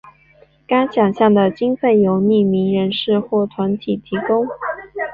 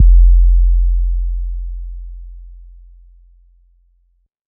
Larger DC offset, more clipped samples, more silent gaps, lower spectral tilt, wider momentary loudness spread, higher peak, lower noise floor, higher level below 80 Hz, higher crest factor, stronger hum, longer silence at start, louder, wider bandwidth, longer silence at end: neither; neither; neither; second, -9 dB/octave vs -25.5 dB/octave; second, 9 LU vs 25 LU; second, -4 dBFS vs 0 dBFS; second, -51 dBFS vs -57 dBFS; second, -56 dBFS vs -14 dBFS; about the same, 14 dB vs 12 dB; neither; first, 0.7 s vs 0 s; about the same, -17 LUFS vs -16 LUFS; first, 4.9 kHz vs 0.1 kHz; second, 0 s vs 1.9 s